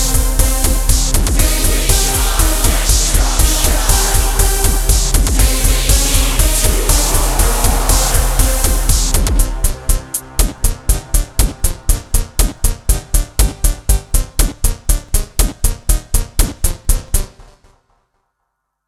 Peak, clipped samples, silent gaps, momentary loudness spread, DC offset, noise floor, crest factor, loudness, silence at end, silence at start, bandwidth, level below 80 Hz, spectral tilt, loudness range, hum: 0 dBFS; under 0.1%; none; 6 LU; under 0.1%; -71 dBFS; 14 dB; -15 LUFS; 1.45 s; 0 s; 17 kHz; -14 dBFS; -3 dB/octave; 5 LU; none